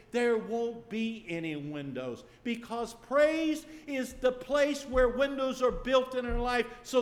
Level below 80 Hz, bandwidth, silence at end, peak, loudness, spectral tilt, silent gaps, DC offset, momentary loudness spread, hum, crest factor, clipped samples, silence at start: -46 dBFS; 15 kHz; 0 s; -14 dBFS; -31 LUFS; -4.5 dB/octave; none; under 0.1%; 11 LU; none; 16 dB; under 0.1%; 0.15 s